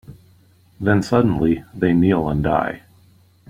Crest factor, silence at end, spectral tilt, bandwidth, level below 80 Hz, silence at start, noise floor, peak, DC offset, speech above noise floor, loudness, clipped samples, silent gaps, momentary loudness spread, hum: 18 dB; 0.7 s; -8 dB/octave; 14 kHz; -42 dBFS; 0.1 s; -53 dBFS; -2 dBFS; under 0.1%; 35 dB; -19 LUFS; under 0.1%; none; 8 LU; none